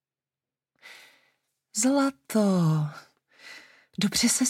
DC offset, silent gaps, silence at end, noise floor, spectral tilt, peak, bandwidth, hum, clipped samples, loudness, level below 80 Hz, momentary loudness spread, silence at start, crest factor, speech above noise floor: under 0.1%; none; 0 s; under -90 dBFS; -4 dB/octave; -12 dBFS; 16.5 kHz; none; under 0.1%; -25 LUFS; -64 dBFS; 23 LU; 0.85 s; 16 dB; over 66 dB